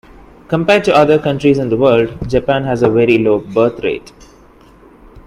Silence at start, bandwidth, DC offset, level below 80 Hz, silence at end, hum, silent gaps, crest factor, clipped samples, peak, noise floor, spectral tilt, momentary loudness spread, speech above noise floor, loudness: 0.5 s; 11.5 kHz; under 0.1%; -40 dBFS; 0.05 s; none; none; 14 dB; under 0.1%; 0 dBFS; -43 dBFS; -7 dB/octave; 8 LU; 31 dB; -13 LUFS